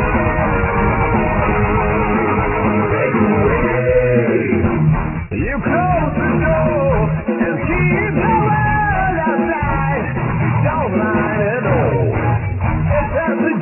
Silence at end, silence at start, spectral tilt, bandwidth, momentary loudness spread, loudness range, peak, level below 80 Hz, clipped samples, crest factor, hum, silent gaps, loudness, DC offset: 0 s; 0 s; -12 dB/octave; 3 kHz; 4 LU; 2 LU; -2 dBFS; -26 dBFS; under 0.1%; 14 dB; none; none; -16 LUFS; under 0.1%